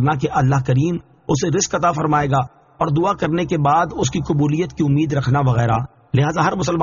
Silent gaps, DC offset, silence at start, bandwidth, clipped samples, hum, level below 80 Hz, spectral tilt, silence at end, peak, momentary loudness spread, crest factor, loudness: none; under 0.1%; 0 s; 7.4 kHz; under 0.1%; none; -42 dBFS; -6.5 dB/octave; 0 s; -4 dBFS; 5 LU; 12 dB; -18 LUFS